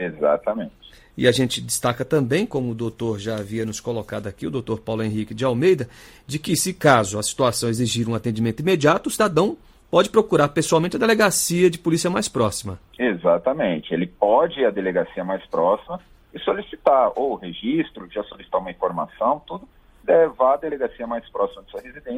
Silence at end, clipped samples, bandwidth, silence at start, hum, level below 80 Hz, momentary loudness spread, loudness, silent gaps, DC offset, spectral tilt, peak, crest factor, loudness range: 0 s; under 0.1%; 16 kHz; 0 s; none; -52 dBFS; 12 LU; -21 LUFS; none; under 0.1%; -4.5 dB/octave; -2 dBFS; 20 dB; 5 LU